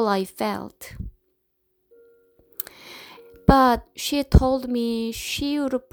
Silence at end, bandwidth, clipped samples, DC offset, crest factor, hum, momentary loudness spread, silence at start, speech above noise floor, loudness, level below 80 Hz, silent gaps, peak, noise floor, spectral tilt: 0.1 s; over 20 kHz; under 0.1%; under 0.1%; 22 dB; none; 23 LU; 0 s; 50 dB; -23 LUFS; -30 dBFS; none; -2 dBFS; -71 dBFS; -5.5 dB/octave